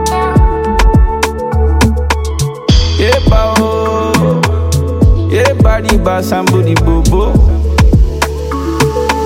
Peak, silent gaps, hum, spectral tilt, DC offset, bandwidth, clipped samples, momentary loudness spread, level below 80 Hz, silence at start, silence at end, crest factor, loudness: 0 dBFS; none; none; -6 dB/octave; under 0.1%; 16.5 kHz; under 0.1%; 4 LU; -14 dBFS; 0 s; 0 s; 10 dB; -11 LUFS